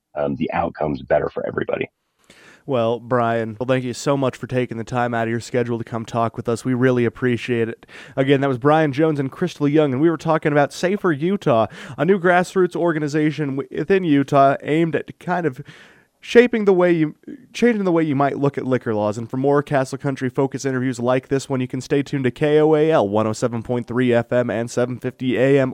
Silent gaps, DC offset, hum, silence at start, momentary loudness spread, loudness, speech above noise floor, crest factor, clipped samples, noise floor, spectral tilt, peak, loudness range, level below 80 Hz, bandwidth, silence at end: none; under 0.1%; none; 0.15 s; 9 LU; -20 LUFS; 31 dB; 20 dB; under 0.1%; -50 dBFS; -7 dB/octave; 0 dBFS; 4 LU; -56 dBFS; 15 kHz; 0 s